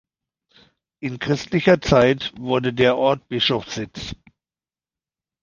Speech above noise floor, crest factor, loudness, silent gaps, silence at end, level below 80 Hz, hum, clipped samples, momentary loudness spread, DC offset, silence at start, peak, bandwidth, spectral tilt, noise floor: over 70 dB; 20 dB; -19 LUFS; none; 1.25 s; -46 dBFS; none; under 0.1%; 15 LU; under 0.1%; 1 s; -2 dBFS; 7.4 kHz; -5.5 dB/octave; under -90 dBFS